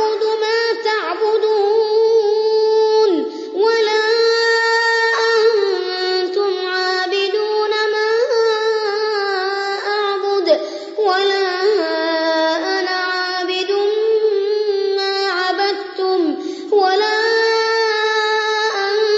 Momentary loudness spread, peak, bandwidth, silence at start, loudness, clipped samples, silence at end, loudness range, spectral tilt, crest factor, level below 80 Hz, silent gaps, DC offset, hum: 5 LU; -2 dBFS; 8 kHz; 0 s; -16 LUFS; under 0.1%; 0 s; 3 LU; -1 dB/octave; 14 dB; -76 dBFS; none; under 0.1%; none